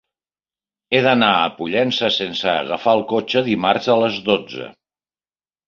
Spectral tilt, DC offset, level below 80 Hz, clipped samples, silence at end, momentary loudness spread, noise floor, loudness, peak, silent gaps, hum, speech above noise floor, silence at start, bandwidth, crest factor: -5.5 dB/octave; under 0.1%; -60 dBFS; under 0.1%; 0.95 s; 6 LU; under -90 dBFS; -18 LUFS; -2 dBFS; none; none; over 72 dB; 0.9 s; 7.2 kHz; 18 dB